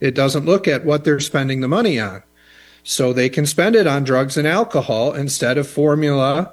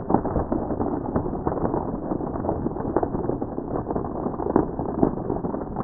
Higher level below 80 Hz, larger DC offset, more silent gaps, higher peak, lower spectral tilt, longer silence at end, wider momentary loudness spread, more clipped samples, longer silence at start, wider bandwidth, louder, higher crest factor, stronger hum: second, -58 dBFS vs -38 dBFS; neither; neither; about the same, -2 dBFS vs -2 dBFS; second, -5 dB/octave vs -7 dB/octave; about the same, 0 s vs 0 s; about the same, 5 LU vs 5 LU; neither; about the same, 0 s vs 0 s; first, 13 kHz vs 2.2 kHz; first, -17 LUFS vs -26 LUFS; second, 16 dB vs 24 dB; neither